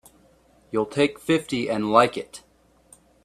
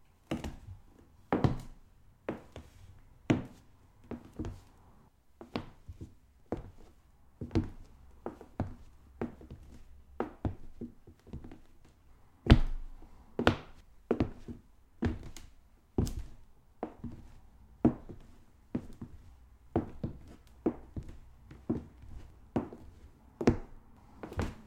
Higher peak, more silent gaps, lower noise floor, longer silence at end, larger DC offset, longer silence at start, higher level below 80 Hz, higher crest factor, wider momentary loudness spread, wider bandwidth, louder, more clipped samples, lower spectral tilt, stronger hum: about the same, -2 dBFS vs -4 dBFS; neither; second, -58 dBFS vs -62 dBFS; first, 0.85 s vs 0 s; neither; first, 0.75 s vs 0.3 s; second, -60 dBFS vs -44 dBFS; second, 22 dB vs 34 dB; second, 17 LU vs 23 LU; about the same, 15 kHz vs 16 kHz; first, -23 LUFS vs -37 LUFS; neither; second, -5 dB/octave vs -7.5 dB/octave; neither